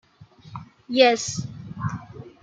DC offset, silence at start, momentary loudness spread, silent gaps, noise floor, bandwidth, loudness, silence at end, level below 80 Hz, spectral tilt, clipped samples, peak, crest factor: under 0.1%; 0.2 s; 23 LU; none; -49 dBFS; 9.2 kHz; -22 LUFS; 0.15 s; -58 dBFS; -4 dB/octave; under 0.1%; -4 dBFS; 22 dB